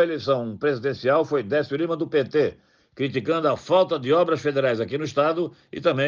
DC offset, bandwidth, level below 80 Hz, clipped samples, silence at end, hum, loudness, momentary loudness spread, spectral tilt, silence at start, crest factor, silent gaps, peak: under 0.1%; 7.2 kHz; -66 dBFS; under 0.1%; 0 s; none; -23 LUFS; 6 LU; -6.5 dB/octave; 0 s; 16 dB; none; -8 dBFS